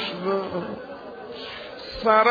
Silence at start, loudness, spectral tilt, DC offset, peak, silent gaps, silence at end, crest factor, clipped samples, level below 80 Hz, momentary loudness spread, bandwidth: 0 s; -26 LUFS; -6.5 dB/octave; under 0.1%; -4 dBFS; none; 0 s; 20 dB; under 0.1%; -54 dBFS; 18 LU; 5 kHz